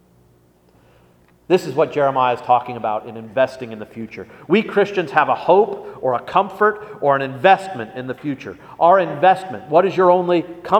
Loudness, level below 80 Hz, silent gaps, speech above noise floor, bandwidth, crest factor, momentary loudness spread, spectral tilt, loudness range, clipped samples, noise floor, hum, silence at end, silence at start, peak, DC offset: -18 LUFS; -62 dBFS; none; 37 dB; 13.5 kHz; 18 dB; 14 LU; -6.5 dB/octave; 3 LU; under 0.1%; -54 dBFS; none; 0 s; 1.5 s; 0 dBFS; under 0.1%